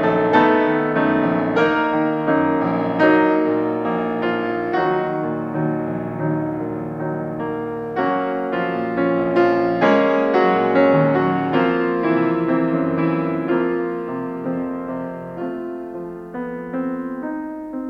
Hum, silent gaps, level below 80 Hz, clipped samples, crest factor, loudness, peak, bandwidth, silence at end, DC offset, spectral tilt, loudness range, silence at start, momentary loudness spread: none; none; -56 dBFS; under 0.1%; 16 dB; -20 LUFS; -2 dBFS; 6.6 kHz; 0 s; under 0.1%; -8.5 dB/octave; 8 LU; 0 s; 12 LU